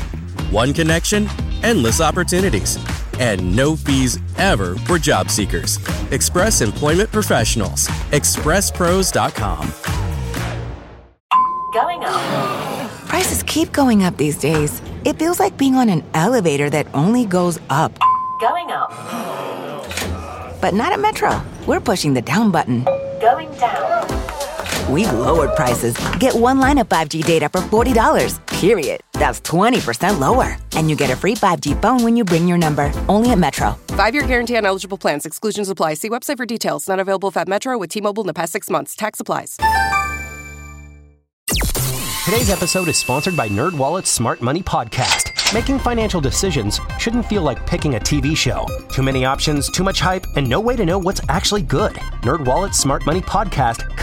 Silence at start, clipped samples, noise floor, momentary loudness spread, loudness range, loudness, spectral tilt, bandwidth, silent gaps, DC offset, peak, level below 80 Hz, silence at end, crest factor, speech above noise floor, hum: 0 s; under 0.1%; -42 dBFS; 8 LU; 4 LU; -17 LUFS; -4.5 dB/octave; 17 kHz; 11.20-11.29 s, 41.33-41.47 s; under 0.1%; -2 dBFS; -30 dBFS; 0 s; 16 dB; 25 dB; none